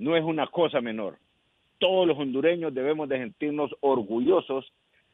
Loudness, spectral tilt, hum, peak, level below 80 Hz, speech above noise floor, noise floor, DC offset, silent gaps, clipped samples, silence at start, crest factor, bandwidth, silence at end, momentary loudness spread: -26 LUFS; -8.5 dB/octave; none; -10 dBFS; -70 dBFS; 21 dB; -46 dBFS; under 0.1%; none; under 0.1%; 0 s; 18 dB; 4 kHz; 0.5 s; 9 LU